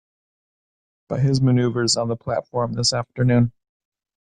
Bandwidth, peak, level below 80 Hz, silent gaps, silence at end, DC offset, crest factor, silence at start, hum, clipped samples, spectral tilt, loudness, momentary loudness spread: 10.5 kHz; -6 dBFS; -50 dBFS; none; 0.8 s; under 0.1%; 16 dB; 1.1 s; none; under 0.1%; -5.5 dB/octave; -21 LUFS; 7 LU